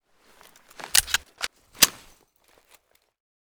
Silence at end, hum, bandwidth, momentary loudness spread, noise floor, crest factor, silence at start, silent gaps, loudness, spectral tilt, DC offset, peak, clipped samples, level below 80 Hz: 1.65 s; none; over 20 kHz; 14 LU; -62 dBFS; 30 dB; 0.85 s; none; -22 LUFS; 1 dB/octave; under 0.1%; 0 dBFS; under 0.1%; -54 dBFS